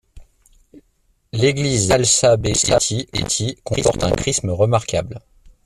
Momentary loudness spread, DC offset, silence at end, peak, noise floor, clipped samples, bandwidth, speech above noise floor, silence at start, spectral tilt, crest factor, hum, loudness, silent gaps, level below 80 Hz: 10 LU; under 0.1%; 0.15 s; -2 dBFS; -62 dBFS; under 0.1%; 14 kHz; 44 dB; 0.15 s; -3.5 dB/octave; 18 dB; none; -17 LUFS; none; -40 dBFS